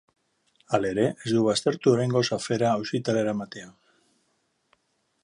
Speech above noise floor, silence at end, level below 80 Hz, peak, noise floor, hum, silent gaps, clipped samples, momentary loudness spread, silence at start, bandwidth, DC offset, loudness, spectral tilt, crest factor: 48 dB; 1.55 s; -64 dBFS; -8 dBFS; -72 dBFS; none; none; under 0.1%; 7 LU; 0.7 s; 11.5 kHz; under 0.1%; -25 LUFS; -5.5 dB/octave; 20 dB